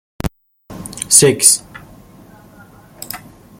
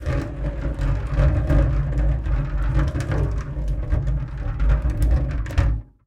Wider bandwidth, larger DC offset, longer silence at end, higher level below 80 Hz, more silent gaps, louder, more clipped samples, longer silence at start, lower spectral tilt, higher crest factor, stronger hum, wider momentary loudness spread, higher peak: first, 17 kHz vs 8.2 kHz; neither; first, 0.45 s vs 0.25 s; second, -40 dBFS vs -22 dBFS; neither; first, -10 LUFS vs -24 LUFS; first, 0.1% vs under 0.1%; first, 0.25 s vs 0 s; second, -2.5 dB/octave vs -8 dB/octave; about the same, 18 dB vs 16 dB; neither; first, 22 LU vs 7 LU; first, 0 dBFS vs -6 dBFS